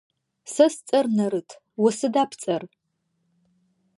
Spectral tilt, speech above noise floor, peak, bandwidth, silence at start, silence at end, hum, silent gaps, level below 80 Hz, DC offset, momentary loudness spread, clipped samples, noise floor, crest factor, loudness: -5 dB/octave; 51 dB; -4 dBFS; 11.5 kHz; 0.45 s; 1.35 s; none; none; -78 dBFS; under 0.1%; 12 LU; under 0.1%; -74 dBFS; 20 dB; -23 LUFS